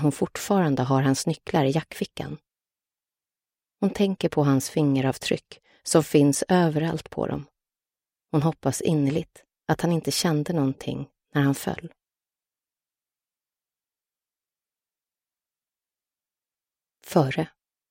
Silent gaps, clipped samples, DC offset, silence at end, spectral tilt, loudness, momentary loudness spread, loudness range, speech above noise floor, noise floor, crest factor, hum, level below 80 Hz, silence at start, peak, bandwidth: none; under 0.1%; under 0.1%; 0.45 s; -5.5 dB/octave; -24 LUFS; 12 LU; 9 LU; over 66 dB; under -90 dBFS; 22 dB; none; -58 dBFS; 0 s; -4 dBFS; 16.5 kHz